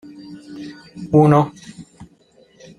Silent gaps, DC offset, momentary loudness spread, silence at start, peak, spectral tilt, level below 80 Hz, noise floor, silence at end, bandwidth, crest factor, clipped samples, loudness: none; under 0.1%; 26 LU; 0.3 s; -2 dBFS; -8.5 dB/octave; -56 dBFS; -53 dBFS; 0.75 s; 10.5 kHz; 20 dB; under 0.1%; -15 LUFS